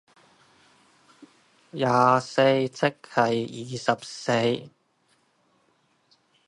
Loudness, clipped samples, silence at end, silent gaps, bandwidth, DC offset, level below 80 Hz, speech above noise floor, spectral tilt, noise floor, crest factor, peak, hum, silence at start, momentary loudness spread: -24 LUFS; under 0.1%; 1.8 s; none; 11.5 kHz; under 0.1%; -72 dBFS; 43 dB; -5.5 dB/octave; -67 dBFS; 22 dB; -4 dBFS; none; 1.2 s; 9 LU